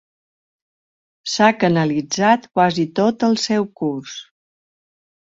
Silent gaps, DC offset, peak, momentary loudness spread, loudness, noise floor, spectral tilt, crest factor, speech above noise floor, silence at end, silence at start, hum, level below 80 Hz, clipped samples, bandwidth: none; under 0.1%; -2 dBFS; 13 LU; -18 LUFS; under -90 dBFS; -5 dB/octave; 18 dB; over 72 dB; 1 s; 1.25 s; none; -62 dBFS; under 0.1%; 7.8 kHz